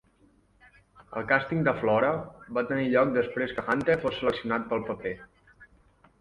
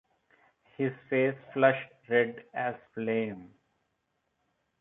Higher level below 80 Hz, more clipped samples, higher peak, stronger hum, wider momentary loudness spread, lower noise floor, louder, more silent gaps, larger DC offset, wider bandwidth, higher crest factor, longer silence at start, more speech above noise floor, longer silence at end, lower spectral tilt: first, -58 dBFS vs -78 dBFS; neither; about the same, -6 dBFS vs -8 dBFS; neither; about the same, 11 LU vs 10 LU; second, -63 dBFS vs -79 dBFS; first, -27 LUFS vs -30 LUFS; neither; neither; first, 10.5 kHz vs 4 kHz; about the same, 22 dB vs 24 dB; first, 1 s vs 0.8 s; second, 36 dB vs 49 dB; second, 0.55 s vs 1.35 s; second, -7.5 dB/octave vs -9.5 dB/octave